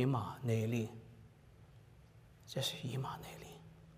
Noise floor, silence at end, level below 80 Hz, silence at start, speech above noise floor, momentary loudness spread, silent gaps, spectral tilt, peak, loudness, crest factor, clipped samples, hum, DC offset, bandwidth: -61 dBFS; 0 s; -68 dBFS; 0 s; 23 dB; 25 LU; none; -6 dB/octave; -22 dBFS; -40 LUFS; 20 dB; under 0.1%; none; under 0.1%; 15.5 kHz